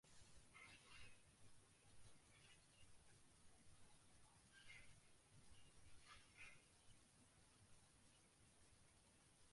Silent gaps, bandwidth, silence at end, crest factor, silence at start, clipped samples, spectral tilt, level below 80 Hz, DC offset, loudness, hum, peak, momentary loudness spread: none; 11.5 kHz; 0 s; 18 dB; 0.05 s; under 0.1%; -2.5 dB/octave; -80 dBFS; under 0.1%; -66 LUFS; none; -50 dBFS; 6 LU